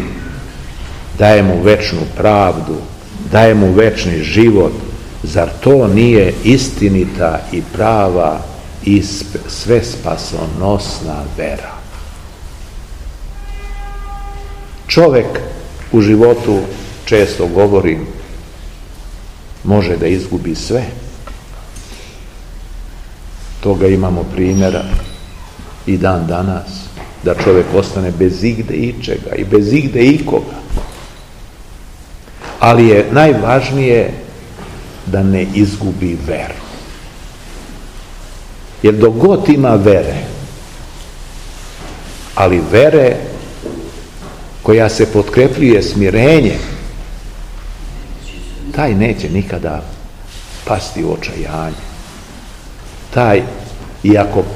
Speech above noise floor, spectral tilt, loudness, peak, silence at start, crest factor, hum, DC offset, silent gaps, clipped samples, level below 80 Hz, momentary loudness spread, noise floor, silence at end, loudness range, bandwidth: 22 dB; -6.5 dB/octave; -12 LUFS; 0 dBFS; 0 s; 14 dB; none; 0.4%; none; 0.8%; -28 dBFS; 24 LU; -33 dBFS; 0 s; 9 LU; 15.5 kHz